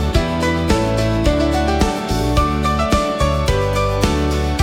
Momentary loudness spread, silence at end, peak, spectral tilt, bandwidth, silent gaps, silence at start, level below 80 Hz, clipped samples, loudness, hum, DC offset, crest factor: 2 LU; 0 s; -2 dBFS; -5.5 dB/octave; 16.5 kHz; none; 0 s; -22 dBFS; under 0.1%; -17 LUFS; none; under 0.1%; 14 dB